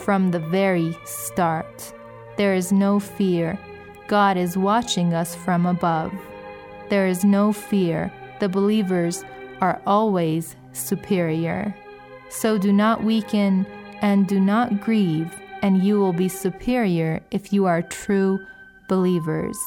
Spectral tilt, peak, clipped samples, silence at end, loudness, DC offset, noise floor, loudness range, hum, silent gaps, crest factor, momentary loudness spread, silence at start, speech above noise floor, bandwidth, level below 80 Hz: -6 dB/octave; -6 dBFS; under 0.1%; 0 s; -22 LUFS; under 0.1%; -42 dBFS; 2 LU; none; none; 16 dB; 14 LU; 0 s; 21 dB; 17.5 kHz; -56 dBFS